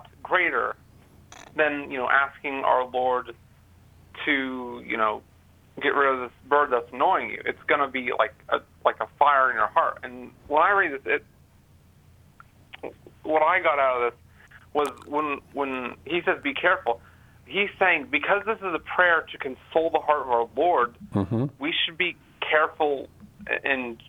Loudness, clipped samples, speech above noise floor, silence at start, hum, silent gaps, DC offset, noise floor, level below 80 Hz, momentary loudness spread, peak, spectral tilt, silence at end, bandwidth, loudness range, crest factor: -24 LUFS; under 0.1%; 31 dB; 0.25 s; none; none; under 0.1%; -56 dBFS; -60 dBFS; 12 LU; -4 dBFS; -5.5 dB/octave; 0.15 s; 17.5 kHz; 4 LU; 22 dB